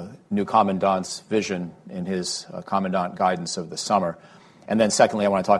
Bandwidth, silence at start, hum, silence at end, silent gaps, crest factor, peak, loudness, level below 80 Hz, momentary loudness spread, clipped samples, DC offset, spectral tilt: 12.5 kHz; 0 s; none; 0 s; none; 20 dB; -4 dBFS; -23 LUFS; -58 dBFS; 11 LU; under 0.1%; under 0.1%; -4.5 dB/octave